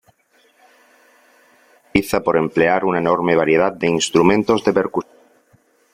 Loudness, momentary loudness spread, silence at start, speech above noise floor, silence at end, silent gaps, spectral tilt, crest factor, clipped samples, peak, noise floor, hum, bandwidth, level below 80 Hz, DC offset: -17 LUFS; 6 LU; 1.95 s; 41 dB; 0.9 s; none; -5 dB/octave; 18 dB; under 0.1%; -2 dBFS; -58 dBFS; none; 16 kHz; -50 dBFS; under 0.1%